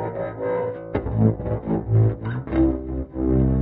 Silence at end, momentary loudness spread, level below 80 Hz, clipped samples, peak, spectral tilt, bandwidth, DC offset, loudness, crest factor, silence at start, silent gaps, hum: 0 s; 8 LU; -32 dBFS; under 0.1%; -4 dBFS; -10.5 dB/octave; 4 kHz; under 0.1%; -23 LUFS; 16 dB; 0 s; none; none